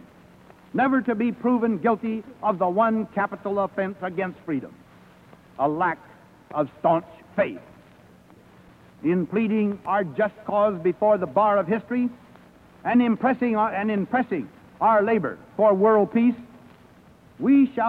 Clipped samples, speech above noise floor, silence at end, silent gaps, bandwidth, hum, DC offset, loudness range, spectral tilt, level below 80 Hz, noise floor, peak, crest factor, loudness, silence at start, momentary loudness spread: under 0.1%; 30 dB; 0 s; none; 4.6 kHz; none; under 0.1%; 6 LU; -9 dB/octave; -64 dBFS; -52 dBFS; -8 dBFS; 16 dB; -23 LUFS; 0.75 s; 11 LU